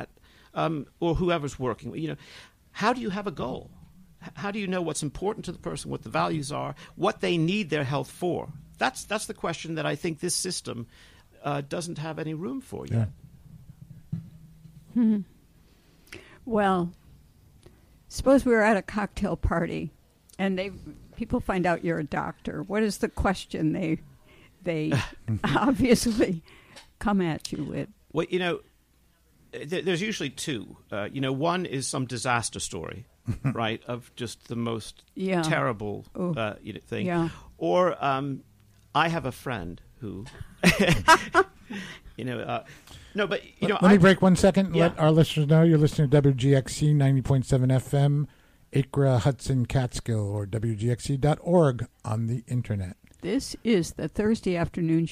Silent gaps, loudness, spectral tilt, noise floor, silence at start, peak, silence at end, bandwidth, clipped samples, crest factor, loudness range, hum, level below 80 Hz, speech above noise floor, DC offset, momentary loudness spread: none; -26 LUFS; -6 dB/octave; -63 dBFS; 0 s; -8 dBFS; 0 s; 15.5 kHz; under 0.1%; 20 dB; 10 LU; none; -46 dBFS; 37 dB; under 0.1%; 16 LU